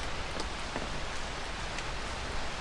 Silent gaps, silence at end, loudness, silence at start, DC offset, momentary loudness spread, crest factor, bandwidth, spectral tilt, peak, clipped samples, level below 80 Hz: none; 0 s; -37 LUFS; 0 s; under 0.1%; 1 LU; 16 dB; 11.5 kHz; -3 dB/octave; -20 dBFS; under 0.1%; -42 dBFS